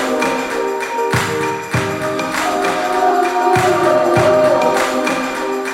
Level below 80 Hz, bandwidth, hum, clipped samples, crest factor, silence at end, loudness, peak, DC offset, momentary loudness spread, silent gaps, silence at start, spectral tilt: -48 dBFS; 16.5 kHz; none; under 0.1%; 14 dB; 0 s; -15 LUFS; -2 dBFS; under 0.1%; 7 LU; none; 0 s; -4.5 dB/octave